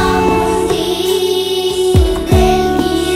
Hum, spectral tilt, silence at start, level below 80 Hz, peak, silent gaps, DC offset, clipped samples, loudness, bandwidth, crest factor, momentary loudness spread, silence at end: none; -5.5 dB/octave; 0 s; -22 dBFS; 0 dBFS; none; under 0.1%; under 0.1%; -13 LUFS; 16 kHz; 12 dB; 3 LU; 0 s